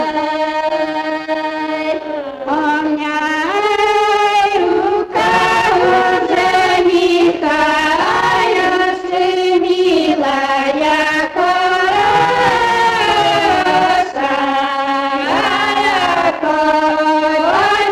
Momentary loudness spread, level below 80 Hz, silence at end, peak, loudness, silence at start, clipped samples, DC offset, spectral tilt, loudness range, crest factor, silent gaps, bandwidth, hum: 5 LU; -46 dBFS; 0 s; -2 dBFS; -13 LUFS; 0 s; under 0.1%; under 0.1%; -3.5 dB/octave; 3 LU; 10 dB; none; 14 kHz; none